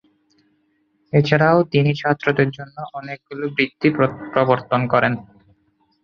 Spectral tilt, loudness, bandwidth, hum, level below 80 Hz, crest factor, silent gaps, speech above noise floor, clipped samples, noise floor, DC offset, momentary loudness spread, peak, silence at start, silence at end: -8 dB/octave; -18 LUFS; 6.6 kHz; none; -56 dBFS; 18 dB; none; 46 dB; under 0.1%; -65 dBFS; under 0.1%; 16 LU; -2 dBFS; 1.15 s; 0.8 s